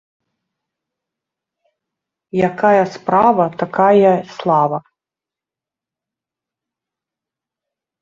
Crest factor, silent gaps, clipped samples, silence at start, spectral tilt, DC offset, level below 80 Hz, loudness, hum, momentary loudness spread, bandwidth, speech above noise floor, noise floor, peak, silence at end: 18 dB; none; under 0.1%; 2.35 s; -7.5 dB/octave; under 0.1%; -60 dBFS; -15 LUFS; none; 8 LU; 7.6 kHz; 74 dB; -88 dBFS; -2 dBFS; 3.2 s